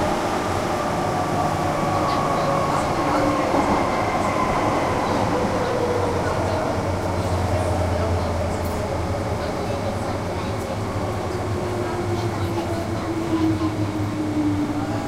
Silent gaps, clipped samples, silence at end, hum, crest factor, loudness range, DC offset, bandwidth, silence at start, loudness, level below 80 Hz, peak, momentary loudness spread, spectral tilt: none; under 0.1%; 0 s; none; 16 dB; 4 LU; under 0.1%; 16 kHz; 0 s; -23 LUFS; -38 dBFS; -6 dBFS; 5 LU; -6 dB/octave